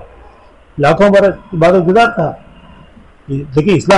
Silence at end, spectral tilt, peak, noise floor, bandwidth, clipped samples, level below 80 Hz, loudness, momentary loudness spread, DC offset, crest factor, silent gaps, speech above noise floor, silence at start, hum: 0 s; -6.5 dB/octave; -2 dBFS; -42 dBFS; 11.5 kHz; under 0.1%; -38 dBFS; -11 LUFS; 15 LU; under 0.1%; 12 dB; none; 31 dB; 0 s; none